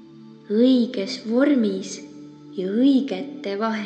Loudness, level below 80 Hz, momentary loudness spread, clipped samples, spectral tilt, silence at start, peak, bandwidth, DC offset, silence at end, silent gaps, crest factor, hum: -21 LUFS; -76 dBFS; 16 LU; under 0.1%; -5.5 dB/octave; 0 s; -6 dBFS; 8.8 kHz; under 0.1%; 0 s; none; 14 dB; none